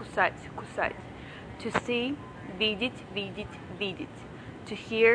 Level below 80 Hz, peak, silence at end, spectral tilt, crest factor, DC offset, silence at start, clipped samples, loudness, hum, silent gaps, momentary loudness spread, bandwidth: -56 dBFS; -8 dBFS; 0 s; -5 dB/octave; 24 dB; under 0.1%; 0 s; under 0.1%; -32 LUFS; none; none; 15 LU; 10 kHz